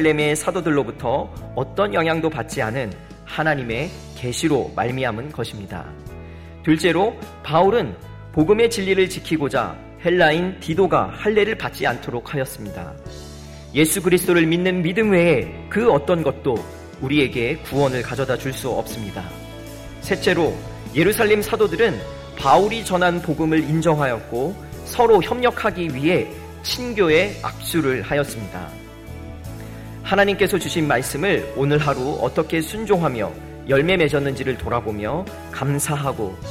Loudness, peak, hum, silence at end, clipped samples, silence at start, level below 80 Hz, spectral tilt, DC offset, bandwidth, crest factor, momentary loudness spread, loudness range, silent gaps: -20 LUFS; -2 dBFS; none; 0 s; under 0.1%; 0 s; -42 dBFS; -5 dB/octave; under 0.1%; 16.5 kHz; 20 dB; 17 LU; 5 LU; none